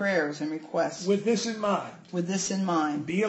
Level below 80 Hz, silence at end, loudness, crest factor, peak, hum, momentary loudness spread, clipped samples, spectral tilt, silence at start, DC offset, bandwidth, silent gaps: -72 dBFS; 0 s; -28 LUFS; 14 dB; -14 dBFS; none; 6 LU; under 0.1%; -4.5 dB/octave; 0 s; under 0.1%; 8.4 kHz; none